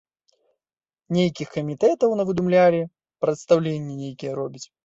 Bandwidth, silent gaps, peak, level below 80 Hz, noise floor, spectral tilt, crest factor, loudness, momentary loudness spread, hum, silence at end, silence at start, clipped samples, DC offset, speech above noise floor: 7.8 kHz; none; -4 dBFS; -62 dBFS; under -90 dBFS; -7 dB/octave; 18 dB; -22 LUFS; 14 LU; none; 0.2 s; 1.1 s; under 0.1%; under 0.1%; over 68 dB